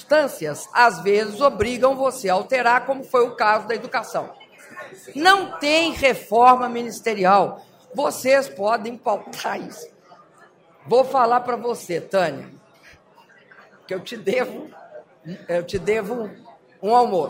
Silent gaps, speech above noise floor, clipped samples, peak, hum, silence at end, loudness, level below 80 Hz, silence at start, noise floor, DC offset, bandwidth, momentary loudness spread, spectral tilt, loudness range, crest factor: none; 32 dB; under 0.1%; -2 dBFS; none; 0 s; -20 LUFS; -54 dBFS; 0.1 s; -52 dBFS; under 0.1%; 16 kHz; 18 LU; -4 dB/octave; 9 LU; 18 dB